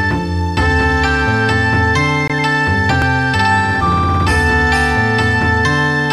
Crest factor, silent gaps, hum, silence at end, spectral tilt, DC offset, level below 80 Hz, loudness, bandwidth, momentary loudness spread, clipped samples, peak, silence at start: 12 dB; none; none; 0 s; -5.5 dB/octave; 0.3%; -26 dBFS; -13 LUFS; 13 kHz; 2 LU; under 0.1%; -2 dBFS; 0 s